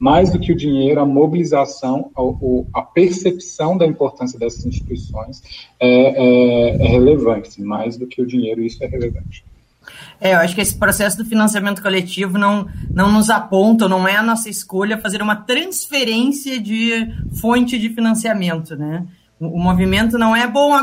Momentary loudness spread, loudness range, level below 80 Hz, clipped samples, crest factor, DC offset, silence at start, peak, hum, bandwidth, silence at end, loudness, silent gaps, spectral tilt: 12 LU; 4 LU; -34 dBFS; under 0.1%; 16 dB; under 0.1%; 0 s; 0 dBFS; none; 16 kHz; 0 s; -16 LUFS; none; -5 dB/octave